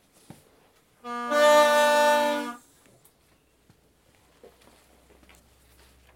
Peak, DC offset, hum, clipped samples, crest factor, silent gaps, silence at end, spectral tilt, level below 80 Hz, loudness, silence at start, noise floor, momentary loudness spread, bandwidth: -8 dBFS; under 0.1%; none; under 0.1%; 18 dB; none; 3.6 s; -1.5 dB/octave; -68 dBFS; -21 LUFS; 1.05 s; -63 dBFS; 21 LU; 16.5 kHz